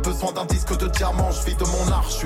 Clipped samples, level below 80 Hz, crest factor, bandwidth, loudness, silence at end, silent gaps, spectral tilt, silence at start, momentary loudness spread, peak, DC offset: under 0.1%; -24 dBFS; 12 dB; 16 kHz; -23 LUFS; 0 s; none; -4.5 dB/octave; 0 s; 3 LU; -10 dBFS; under 0.1%